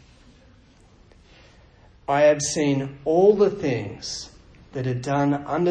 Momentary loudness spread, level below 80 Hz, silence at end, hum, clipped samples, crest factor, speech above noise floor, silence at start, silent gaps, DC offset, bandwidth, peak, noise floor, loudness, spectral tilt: 15 LU; -54 dBFS; 0 s; none; under 0.1%; 18 dB; 32 dB; 2.1 s; none; under 0.1%; 10 kHz; -6 dBFS; -53 dBFS; -22 LUFS; -5.5 dB/octave